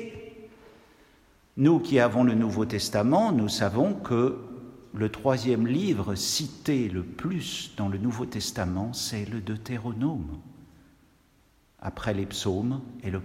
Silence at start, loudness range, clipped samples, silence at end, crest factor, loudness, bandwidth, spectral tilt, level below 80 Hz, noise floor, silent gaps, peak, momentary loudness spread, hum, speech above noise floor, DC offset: 0 s; 9 LU; under 0.1%; 0 s; 20 dB; -27 LUFS; 16 kHz; -5.5 dB/octave; -56 dBFS; -63 dBFS; none; -8 dBFS; 16 LU; none; 36 dB; under 0.1%